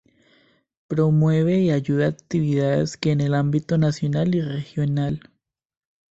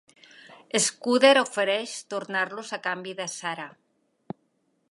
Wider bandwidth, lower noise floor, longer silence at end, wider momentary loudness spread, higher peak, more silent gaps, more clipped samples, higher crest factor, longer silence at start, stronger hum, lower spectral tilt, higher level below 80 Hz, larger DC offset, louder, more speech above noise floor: second, 8 kHz vs 11.5 kHz; second, -60 dBFS vs -71 dBFS; second, 0.9 s vs 1.25 s; second, 7 LU vs 24 LU; second, -6 dBFS vs -2 dBFS; neither; neither; second, 16 dB vs 26 dB; first, 0.9 s vs 0.5 s; neither; first, -8 dB/octave vs -2 dB/octave; first, -54 dBFS vs -82 dBFS; neither; first, -21 LUFS vs -25 LUFS; second, 40 dB vs 46 dB